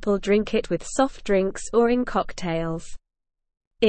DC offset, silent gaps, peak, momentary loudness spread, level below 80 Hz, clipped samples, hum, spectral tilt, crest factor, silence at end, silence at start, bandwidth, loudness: 0.4%; 3.67-3.71 s; -8 dBFS; 7 LU; -42 dBFS; under 0.1%; none; -5.5 dB/octave; 16 dB; 0 s; 0 s; 8.8 kHz; -24 LUFS